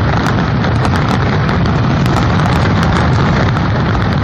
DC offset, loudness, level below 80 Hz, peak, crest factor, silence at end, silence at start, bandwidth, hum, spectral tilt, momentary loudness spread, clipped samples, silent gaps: under 0.1%; -13 LUFS; -24 dBFS; 0 dBFS; 12 dB; 0 s; 0 s; 10.5 kHz; none; -7 dB/octave; 2 LU; under 0.1%; none